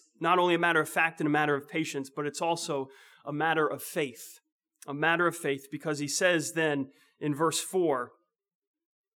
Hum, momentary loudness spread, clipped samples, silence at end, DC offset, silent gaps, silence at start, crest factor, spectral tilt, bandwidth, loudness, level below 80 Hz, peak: none; 14 LU; under 0.1%; 1.1 s; under 0.1%; 4.52-4.59 s; 0.2 s; 20 dB; -4 dB/octave; 20 kHz; -29 LUFS; under -90 dBFS; -10 dBFS